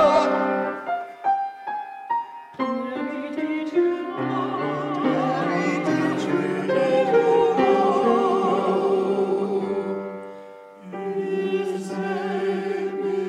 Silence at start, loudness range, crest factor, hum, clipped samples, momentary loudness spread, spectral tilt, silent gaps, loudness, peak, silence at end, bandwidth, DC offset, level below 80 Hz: 0 s; 7 LU; 14 dB; none; under 0.1%; 11 LU; -6.5 dB/octave; none; -23 LUFS; -8 dBFS; 0 s; 11 kHz; under 0.1%; -66 dBFS